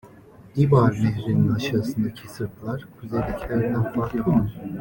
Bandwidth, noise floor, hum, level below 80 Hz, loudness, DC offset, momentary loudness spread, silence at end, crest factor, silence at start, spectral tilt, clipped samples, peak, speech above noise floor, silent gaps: 17 kHz; -47 dBFS; none; -44 dBFS; -24 LUFS; under 0.1%; 14 LU; 0 s; 18 dB; 0.05 s; -8 dB/octave; under 0.1%; -6 dBFS; 25 dB; none